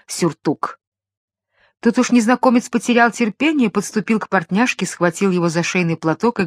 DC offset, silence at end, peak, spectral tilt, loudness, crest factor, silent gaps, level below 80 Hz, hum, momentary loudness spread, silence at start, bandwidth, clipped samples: under 0.1%; 0 s; 0 dBFS; -5 dB/octave; -17 LUFS; 18 dB; 0.87-0.92 s, 1.17-1.28 s; -62 dBFS; none; 7 LU; 0.1 s; 14 kHz; under 0.1%